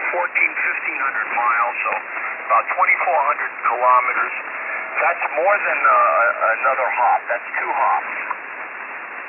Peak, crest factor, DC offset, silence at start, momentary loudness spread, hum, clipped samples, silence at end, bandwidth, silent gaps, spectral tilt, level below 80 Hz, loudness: -4 dBFS; 16 dB; under 0.1%; 0 s; 10 LU; none; under 0.1%; 0 s; 3.2 kHz; none; -6 dB/octave; -80 dBFS; -18 LUFS